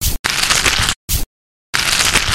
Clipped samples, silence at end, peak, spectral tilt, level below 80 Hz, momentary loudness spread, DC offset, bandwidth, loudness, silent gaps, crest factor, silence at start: under 0.1%; 0 s; 0 dBFS; -1 dB/octave; -26 dBFS; 9 LU; under 0.1%; 17.5 kHz; -14 LUFS; 0.19-0.24 s, 0.96-1.08 s, 1.26-1.73 s; 16 dB; 0 s